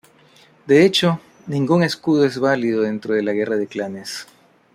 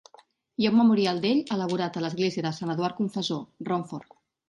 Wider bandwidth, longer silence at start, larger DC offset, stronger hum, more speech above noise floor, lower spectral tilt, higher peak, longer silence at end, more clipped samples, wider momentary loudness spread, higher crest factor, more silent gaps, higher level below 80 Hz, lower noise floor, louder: first, 15 kHz vs 11 kHz; about the same, 0.65 s vs 0.6 s; neither; neither; about the same, 33 dB vs 32 dB; about the same, -5.5 dB/octave vs -6 dB/octave; first, -2 dBFS vs -12 dBFS; about the same, 0.5 s vs 0.45 s; neither; about the same, 13 LU vs 11 LU; about the same, 16 dB vs 16 dB; neither; first, -62 dBFS vs -70 dBFS; second, -51 dBFS vs -58 dBFS; first, -19 LUFS vs -26 LUFS